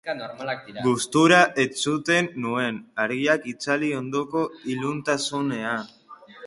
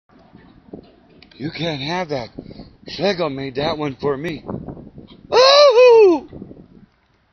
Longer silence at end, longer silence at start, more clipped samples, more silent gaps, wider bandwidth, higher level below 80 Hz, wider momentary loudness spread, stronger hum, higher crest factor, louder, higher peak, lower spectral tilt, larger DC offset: second, 0 s vs 0.9 s; second, 0.05 s vs 0.75 s; neither; neither; first, 11.5 kHz vs 6.6 kHz; second, -66 dBFS vs -50 dBFS; second, 14 LU vs 24 LU; neither; about the same, 20 dB vs 18 dB; second, -23 LUFS vs -15 LUFS; second, -4 dBFS vs 0 dBFS; first, -4 dB/octave vs -2.5 dB/octave; neither